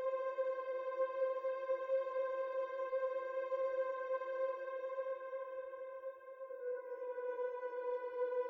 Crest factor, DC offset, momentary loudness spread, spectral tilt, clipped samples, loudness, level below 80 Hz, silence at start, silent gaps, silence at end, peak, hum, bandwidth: 14 dB; under 0.1%; 9 LU; -3.5 dB/octave; under 0.1%; -41 LUFS; under -90 dBFS; 0 s; none; 0 s; -26 dBFS; none; 4.9 kHz